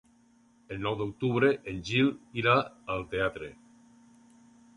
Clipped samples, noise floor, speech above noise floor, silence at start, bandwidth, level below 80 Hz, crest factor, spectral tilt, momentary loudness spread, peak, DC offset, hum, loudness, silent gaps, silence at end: under 0.1%; -63 dBFS; 34 dB; 0.7 s; 11 kHz; -58 dBFS; 20 dB; -6.5 dB/octave; 10 LU; -10 dBFS; under 0.1%; none; -29 LUFS; none; 1.2 s